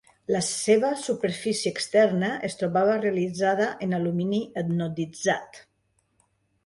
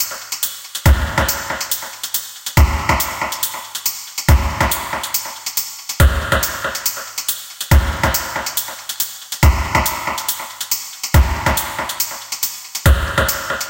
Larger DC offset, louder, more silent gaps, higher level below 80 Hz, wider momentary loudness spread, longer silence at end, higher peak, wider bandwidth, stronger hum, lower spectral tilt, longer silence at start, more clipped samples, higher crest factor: neither; second, -25 LUFS vs -18 LUFS; neither; second, -66 dBFS vs -22 dBFS; about the same, 7 LU vs 7 LU; first, 1.05 s vs 0 s; second, -8 dBFS vs 0 dBFS; second, 11.5 kHz vs 17.5 kHz; neither; first, -5 dB/octave vs -3.5 dB/octave; first, 0.3 s vs 0 s; neither; about the same, 18 dB vs 16 dB